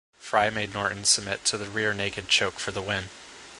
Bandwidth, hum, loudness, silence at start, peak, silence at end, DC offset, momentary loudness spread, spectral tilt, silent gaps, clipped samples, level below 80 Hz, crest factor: 11.5 kHz; none; -25 LUFS; 0.2 s; -6 dBFS; 0 s; under 0.1%; 9 LU; -1.5 dB/octave; none; under 0.1%; -54 dBFS; 22 dB